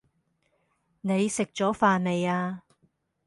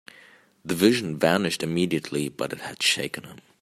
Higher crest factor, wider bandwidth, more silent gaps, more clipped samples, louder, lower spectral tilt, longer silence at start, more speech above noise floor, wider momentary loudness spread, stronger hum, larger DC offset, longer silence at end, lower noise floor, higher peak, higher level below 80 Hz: about the same, 20 dB vs 22 dB; second, 11.5 kHz vs 16 kHz; neither; neither; about the same, -26 LUFS vs -24 LUFS; first, -5.5 dB/octave vs -4 dB/octave; first, 1.05 s vs 0.65 s; first, 47 dB vs 29 dB; about the same, 12 LU vs 11 LU; neither; neither; first, 0.7 s vs 0.25 s; first, -72 dBFS vs -54 dBFS; second, -8 dBFS vs -4 dBFS; about the same, -66 dBFS vs -64 dBFS